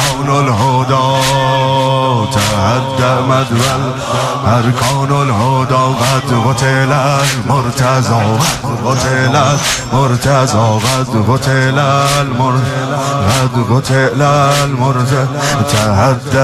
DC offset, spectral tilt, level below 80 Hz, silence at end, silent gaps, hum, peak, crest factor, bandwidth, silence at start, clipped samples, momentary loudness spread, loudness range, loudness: under 0.1%; -5 dB/octave; -38 dBFS; 0 s; none; none; 0 dBFS; 10 dB; 15 kHz; 0 s; under 0.1%; 3 LU; 1 LU; -12 LUFS